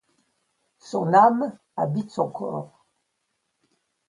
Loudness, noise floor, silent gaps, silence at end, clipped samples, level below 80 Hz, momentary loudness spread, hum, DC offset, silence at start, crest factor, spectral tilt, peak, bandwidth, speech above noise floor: -23 LUFS; -76 dBFS; none; 1.45 s; under 0.1%; -72 dBFS; 15 LU; none; under 0.1%; 0.85 s; 20 dB; -7.5 dB/octave; -6 dBFS; 11 kHz; 54 dB